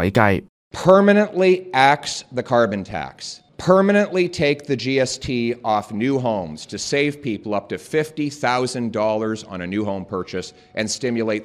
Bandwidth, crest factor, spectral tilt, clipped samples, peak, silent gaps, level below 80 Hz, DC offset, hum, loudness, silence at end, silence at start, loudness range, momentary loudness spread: 14 kHz; 20 dB; -5 dB/octave; under 0.1%; 0 dBFS; 0.49-0.71 s; -52 dBFS; under 0.1%; none; -20 LUFS; 0 s; 0 s; 6 LU; 13 LU